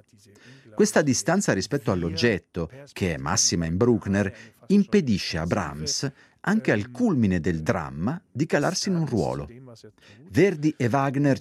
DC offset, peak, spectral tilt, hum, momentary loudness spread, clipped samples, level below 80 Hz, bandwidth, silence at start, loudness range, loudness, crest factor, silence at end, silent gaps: under 0.1%; -4 dBFS; -5 dB/octave; none; 9 LU; under 0.1%; -54 dBFS; 14 kHz; 0.45 s; 2 LU; -24 LUFS; 20 dB; 0 s; none